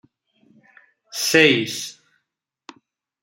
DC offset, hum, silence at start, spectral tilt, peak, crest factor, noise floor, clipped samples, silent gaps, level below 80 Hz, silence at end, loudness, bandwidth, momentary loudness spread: under 0.1%; none; 1.15 s; -3 dB/octave; 0 dBFS; 24 dB; -79 dBFS; under 0.1%; none; -68 dBFS; 1.3 s; -17 LUFS; 16.5 kHz; 19 LU